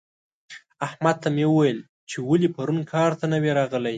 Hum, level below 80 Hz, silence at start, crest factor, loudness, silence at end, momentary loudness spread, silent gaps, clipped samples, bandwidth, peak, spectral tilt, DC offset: none; -68 dBFS; 0.5 s; 18 dB; -23 LUFS; 0 s; 12 LU; 1.89-2.07 s; under 0.1%; 9.2 kHz; -6 dBFS; -7 dB/octave; under 0.1%